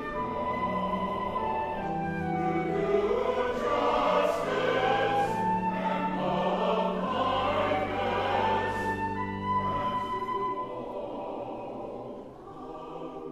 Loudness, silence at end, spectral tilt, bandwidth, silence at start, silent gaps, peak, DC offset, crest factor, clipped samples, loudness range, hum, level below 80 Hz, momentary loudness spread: -29 LUFS; 0 s; -6.5 dB/octave; 15 kHz; 0 s; none; -14 dBFS; under 0.1%; 16 dB; under 0.1%; 6 LU; none; -52 dBFS; 12 LU